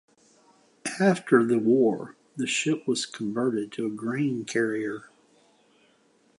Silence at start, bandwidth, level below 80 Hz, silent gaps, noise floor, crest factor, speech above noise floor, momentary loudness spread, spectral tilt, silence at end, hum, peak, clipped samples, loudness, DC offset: 0.85 s; 11.5 kHz; -76 dBFS; none; -63 dBFS; 20 dB; 38 dB; 13 LU; -5 dB/octave; 1.35 s; none; -6 dBFS; under 0.1%; -26 LUFS; under 0.1%